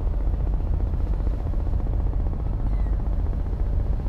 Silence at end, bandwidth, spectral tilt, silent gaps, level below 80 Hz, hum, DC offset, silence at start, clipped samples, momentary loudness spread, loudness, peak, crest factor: 0 s; 3 kHz; -10 dB/octave; none; -24 dBFS; none; under 0.1%; 0 s; under 0.1%; 1 LU; -27 LUFS; -12 dBFS; 10 dB